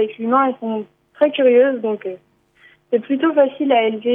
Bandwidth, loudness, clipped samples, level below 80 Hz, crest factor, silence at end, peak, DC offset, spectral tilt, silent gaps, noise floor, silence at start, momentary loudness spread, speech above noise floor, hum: 3.7 kHz; -17 LUFS; under 0.1%; -74 dBFS; 16 dB; 0 s; -2 dBFS; under 0.1%; -8.5 dB/octave; none; -53 dBFS; 0 s; 14 LU; 36 dB; none